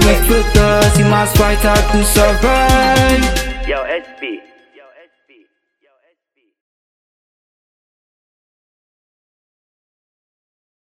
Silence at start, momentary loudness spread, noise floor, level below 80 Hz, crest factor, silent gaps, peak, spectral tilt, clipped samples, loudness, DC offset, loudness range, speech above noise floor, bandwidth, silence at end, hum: 0 s; 11 LU; -66 dBFS; -22 dBFS; 16 dB; none; 0 dBFS; -4.5 dB/octave; under 0.1%; -12 LUFS; under 0.1%; 17 LU; 55 dB; 17 kHz; 6.6 s; none